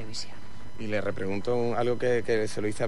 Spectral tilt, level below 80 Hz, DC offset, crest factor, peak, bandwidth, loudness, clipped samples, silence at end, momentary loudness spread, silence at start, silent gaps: -5.5 dB/octave; -54 dBFS; 4%; 14 dB; -14 dBFS; 12 kHz; -29 LUFS; under 0.1%; 0 s; 15 LU; 0 s; none